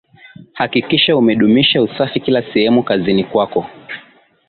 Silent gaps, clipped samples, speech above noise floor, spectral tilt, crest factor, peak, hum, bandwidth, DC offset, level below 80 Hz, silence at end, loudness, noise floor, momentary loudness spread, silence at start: none; under 0.1%; 27 dB; -10 dB/octave; 14 dB; -2 dBFS; none; 4.7 kHz; under 0.1%; -52 dBFS; 0.5 s; -14 LUFS; -41 dBFS; 14 LU; 0.4 s